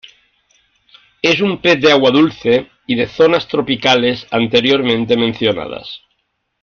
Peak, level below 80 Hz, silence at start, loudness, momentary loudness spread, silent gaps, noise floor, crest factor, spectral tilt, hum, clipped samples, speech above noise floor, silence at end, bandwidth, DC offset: 0 dBFS; -52 dBFS; 1.25 s; -14 LUFS; 10 LU; none; -68 dBFS; 14 dB; -5 dB/octave; none; under 0.1%; 55 dB; 0.65 s; 7 kHz; under 0.1%